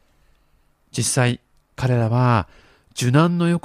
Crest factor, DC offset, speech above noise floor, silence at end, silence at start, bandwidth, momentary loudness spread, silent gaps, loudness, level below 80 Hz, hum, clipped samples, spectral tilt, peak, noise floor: 20 dB; under 0.1%; 42 dB; 0.05 s; 0.95 s; 15 kHz; 15 LU; none; -19 LUFS; -50 dBFS; none; under 0.1%; -5.5 dB/octave; -2 dBFS; -60 dBFS